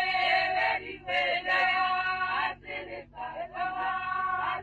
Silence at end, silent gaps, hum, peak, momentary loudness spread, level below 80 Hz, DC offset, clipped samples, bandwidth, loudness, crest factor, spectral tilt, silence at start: 0 s; none; none; -14 dBFS; 13 LU; -60 dBFS; under 0.1%; under 0.1%; 8.6 kHz; -28 LUFS; 14 dB; -3.5 dB/octave; 0 s